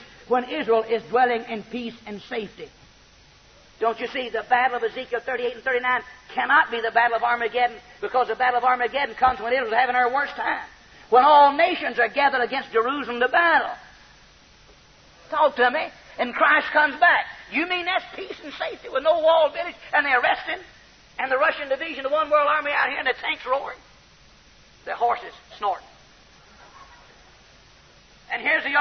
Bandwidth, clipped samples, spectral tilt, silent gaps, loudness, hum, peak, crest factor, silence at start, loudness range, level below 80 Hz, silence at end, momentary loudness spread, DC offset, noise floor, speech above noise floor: 6.4 kHz; under 0.1%; -4 dB/octave; none; -22 LUFS; none; -6 dBFS; 18 dB; 0 s; 10 LU; -58 dBFS; 0 s; 14 LU; under 0.1%; -53 dBFS; 31 dB